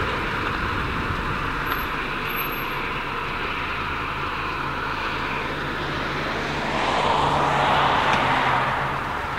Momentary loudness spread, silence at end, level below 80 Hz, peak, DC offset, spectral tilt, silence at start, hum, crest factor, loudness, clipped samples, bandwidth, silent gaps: 7 LU; 0 s; -38 dBFS; -8 dBFS; under 0.1%; -5 dB/octave; 0 s; none; 16 dB; -23 LUFS; under 0.1%; 16 kHz; none